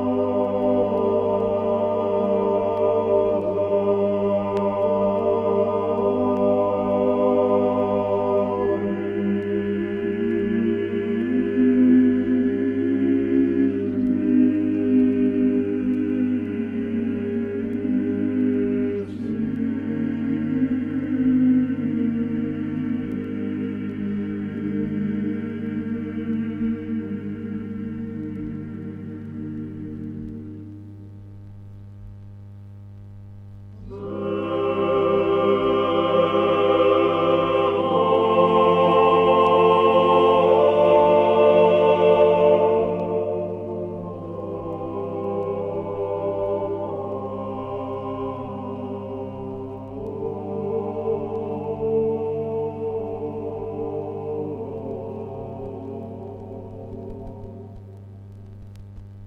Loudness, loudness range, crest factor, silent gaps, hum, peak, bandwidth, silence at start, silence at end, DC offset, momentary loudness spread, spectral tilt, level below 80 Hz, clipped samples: -22 LUFS; 16 LU; 18 dB; none; 50 Hz at -40 dBFS; -4 dBFS; 5 kHz; 0 s; 0 s; under 0.1%; 19 LU; -9 dB/octave; -52 dBFS; under 0.1%